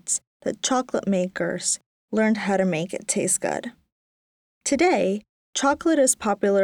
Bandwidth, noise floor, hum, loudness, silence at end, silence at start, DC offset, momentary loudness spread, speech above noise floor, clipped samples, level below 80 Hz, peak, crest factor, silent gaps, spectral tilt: 19 kHz; under -90 dBFS; none; -23 LUFS; 0 s; 0.05 s; under 0.1%; 10 LU; over 68 dB; under 0.1%; -62 dBFS; -8 dBFS; 16 dB; 0.27-0.40 s, 1.86-2.08 s, 3.92-4.61 s, 5.29-5.53 s; -3.5 dB/octave